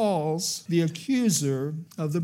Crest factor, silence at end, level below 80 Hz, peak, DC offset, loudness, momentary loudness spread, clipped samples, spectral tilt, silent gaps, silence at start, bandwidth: 14 dB; 0 s; -78 dBFS; -12 dBFS; under 0.1%; -26 LUFS; 7 LU; under 0.1%; -5 dB/octave; none; 0 s; 16.5 kHz